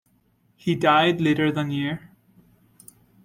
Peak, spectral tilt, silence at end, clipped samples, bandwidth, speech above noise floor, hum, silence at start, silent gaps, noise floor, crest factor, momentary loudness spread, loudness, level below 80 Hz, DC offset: -6 dBFS; -6.5 dB/octave; 1.25 s; under 0.1%; 16.5 kHz; 43 dB; none; 0.65 s; none; -64 dBFS; 20 dB; 12 LU; -22 LUFS; -60 dBFS; under 0.1%